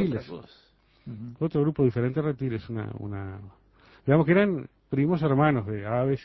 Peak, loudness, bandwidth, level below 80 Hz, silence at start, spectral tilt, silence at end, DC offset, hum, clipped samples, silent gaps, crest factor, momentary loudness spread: -8 dBFS; -26 LUFS; 5.8 kHz; -54 dBFS; 0 s; -11 dB/octave; 0 s; under 0.1%; none; under 0.1%; none; 20 dB; 18 LU